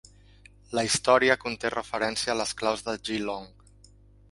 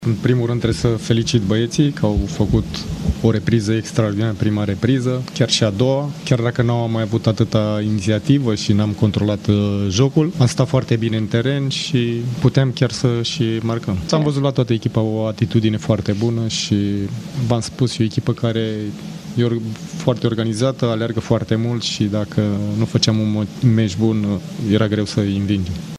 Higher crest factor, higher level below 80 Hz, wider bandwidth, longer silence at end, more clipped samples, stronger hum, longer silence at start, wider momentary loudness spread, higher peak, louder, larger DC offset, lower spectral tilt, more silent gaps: about the same, 22 dB vs 18 dB; second, -56 dBFS vs -38 dBFS; about the same, 11.5 kHz vs 11.5 kHz; first, 0.85 s vs 0 s; neither; first, 50 Hz at -55 dBFS vs none; first, 0.7 s vs 0 s; first, 11 LU vs 5 LU; second, -6 dBFS vs 0 dBFS; second, -26 LUFS vs -18 LUFS; neither; second, -2.5 dB/octave vs -6 dB/octave; neither